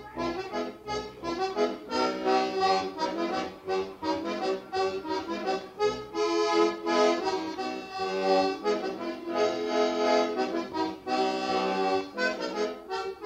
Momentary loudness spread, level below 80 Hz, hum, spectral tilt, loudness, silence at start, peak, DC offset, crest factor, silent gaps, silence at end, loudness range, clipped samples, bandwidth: 8 LU; -62 dBFS; none; -4 dB/octave; -29 LUFS; 0 s; -12 dBFS; under 0.1%; 16 dB; none; 0 s; 3 LU; under 0.1%; 15 kHz